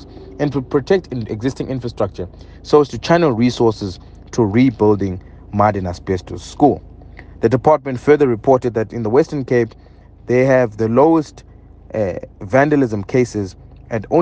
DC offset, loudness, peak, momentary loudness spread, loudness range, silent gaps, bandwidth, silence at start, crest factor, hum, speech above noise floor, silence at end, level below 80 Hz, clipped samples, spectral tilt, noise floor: under 0.1%; -17 LUFS; 0 dBFS; 13 LU; 2 LU; none; 9 kHz; 0 s; 16 dB; none; 22 dB; 0 s; -42 dBFS; under 0.1%; -7.5 dB/octave; -37 dBFS